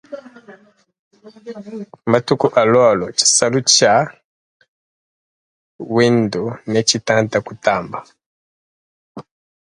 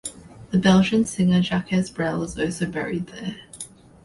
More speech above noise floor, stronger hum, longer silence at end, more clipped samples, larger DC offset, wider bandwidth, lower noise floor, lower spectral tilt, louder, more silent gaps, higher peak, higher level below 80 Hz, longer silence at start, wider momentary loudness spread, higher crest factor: first, 32 dB vs 21 dB; neither; about the same, 0.4 s vs 0.4 s; neither; neither; about the same, 11.5 kHz vs 11.5 kHz; first, -48 dBFS vs -42 dBFS; second, -3 dB/octave vs -5.5 dB/octave; first, -15 LUFS vs -22 LUFS; first, 0.99-1.11 s, 4.24-4.60 s, 4.68-5.79 s, 8.26-9.15 s vs none; first, 0 dBFS vs -4 dBFS; second, -56 dBFS vs -50 dBFS; about the same, 0.1 s vs 0.05 s; about the same, 20 LU vs 19 LU; about the same, 18 dB vs 18 dB